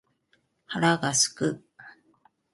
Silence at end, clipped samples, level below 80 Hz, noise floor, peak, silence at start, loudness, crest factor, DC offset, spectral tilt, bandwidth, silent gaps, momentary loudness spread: 0.65 s; under 0.1%; -68 dBFS; -70 dBFS; -6 dBFS; 0.7 s; -25 LUFS; 22 dB; under 0.1%; -3 dB/octave; 12 kHz; none; 13 LU